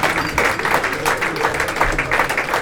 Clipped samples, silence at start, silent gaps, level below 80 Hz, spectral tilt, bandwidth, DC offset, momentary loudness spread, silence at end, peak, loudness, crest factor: under 0.1%; 0 s; none; -34 dBFS; -3 dB/octave; 19 kHz; under 0.1%; 2 LU; 0 s; 0 dBFS; -18 LUFS; 18 dB